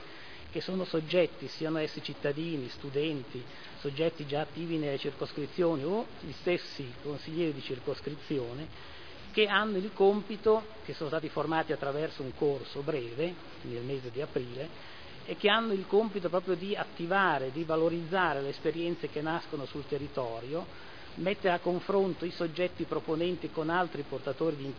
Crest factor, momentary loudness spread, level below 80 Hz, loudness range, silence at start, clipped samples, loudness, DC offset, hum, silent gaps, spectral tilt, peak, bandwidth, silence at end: 22 dB; 12 LU; -64 dBFS; 5 LU; 0 s; under 0.1%; -33 LUFS; 0.4%; none; none; -7 dB/octave; -10 dBFS; 5.4 kHz; 0 s